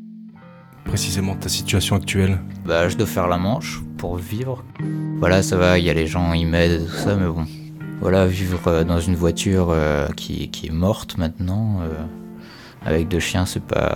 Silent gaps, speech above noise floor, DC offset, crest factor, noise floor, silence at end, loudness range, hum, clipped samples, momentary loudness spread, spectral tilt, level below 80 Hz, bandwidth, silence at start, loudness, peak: none; 23 dB; under 0.1%; 20 dB; -43 dBFS; 0 s; 4 LU; none; under 0.1%; 12 LU; -5.5 dB/octave; -36 dBFS; 18.5 kHz; 0 s; -21 LUFS; 0 dBFS